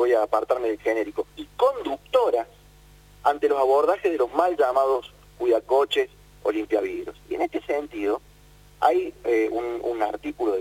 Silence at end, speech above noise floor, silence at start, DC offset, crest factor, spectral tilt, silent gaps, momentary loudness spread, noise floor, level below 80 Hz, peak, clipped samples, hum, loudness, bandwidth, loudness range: 0 s; 28 dB; 0 s; under 0.1%; 18 dB; -4.5 dB/octave; none; 9 LU; -51 dBFS; -56 dBFS; -6 dBFS; under 0.1%; 50 Hz at -55 dBFS; -24 LUFS; 17 kHz; 4 LU